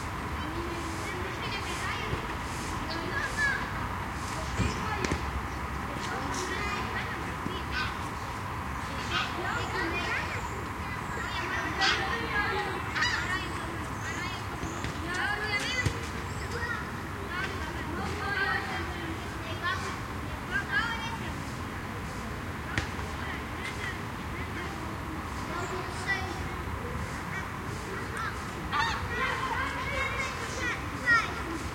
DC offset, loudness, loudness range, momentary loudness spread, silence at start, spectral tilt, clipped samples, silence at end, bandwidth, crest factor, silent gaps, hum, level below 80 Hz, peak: under 0.1%; -32 LUFS; 5 LU; 7 LU; 0 s; -4 dB/octave; under 0.1%; 0 s; 16.5 kHz; 22 dB; none; none; -44 dBFS; -10 dBFS